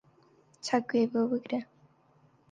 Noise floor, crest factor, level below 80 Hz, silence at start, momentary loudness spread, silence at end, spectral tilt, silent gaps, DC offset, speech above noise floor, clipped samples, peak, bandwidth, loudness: -65 dBFS; 18 dB; -78 dBFS; 0.65 s; 12 LU; 0.9 s; -5 dB/octave; none; under 0.1%; 35 dB; under 0.1%; -14 dBFS; 9.4 kHz; -31 LUFS